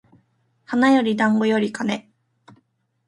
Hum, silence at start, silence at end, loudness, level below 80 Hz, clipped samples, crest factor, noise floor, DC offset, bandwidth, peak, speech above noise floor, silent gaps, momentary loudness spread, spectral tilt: none; 0.7 s; 1.05 s; -20 LUFS; -68 dBFS; under 0.1%; 16 dB; -65 dBFS; under 0.1%; 11 kHz; -6 dBFS; 47 dB; none; 10 LU; -5.5 dB/octave